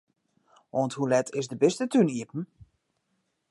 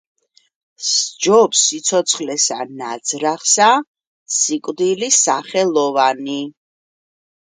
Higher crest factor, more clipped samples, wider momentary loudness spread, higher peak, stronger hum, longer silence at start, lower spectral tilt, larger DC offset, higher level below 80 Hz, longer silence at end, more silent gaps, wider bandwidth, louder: about the same, 20 dB vs 18 dB; neither; about the same, 13 LU vs 12 LU; second, -10 dBFS vs 0 dBFS; neither; about the same, 0.75 s vs 0.8 s; first, -6 dB/octave vs -1.5 dB/octave; neither; about the same, -70 dBFS vs -72 dBFS; about the same, 1.05 s vs 1.05 s; second, none vs 3.87-3.94 s, 4.07-4.26 s; first, 11.5 kHz vs 10 kHz; second, -27 LUFS vs -16 LUFS